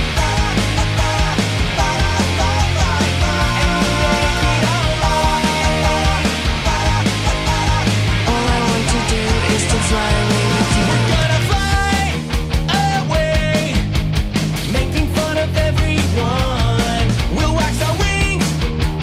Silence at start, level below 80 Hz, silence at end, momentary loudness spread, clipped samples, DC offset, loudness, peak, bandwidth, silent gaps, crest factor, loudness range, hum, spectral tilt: 0 s; -22 dBFS; 0 s; 3 LU; under 0.1%; under 0.1%; -16 LUFS; -4 dBFS; 16 kHz; none; 10 dB; 2 LU; none; -4.5 dB/octave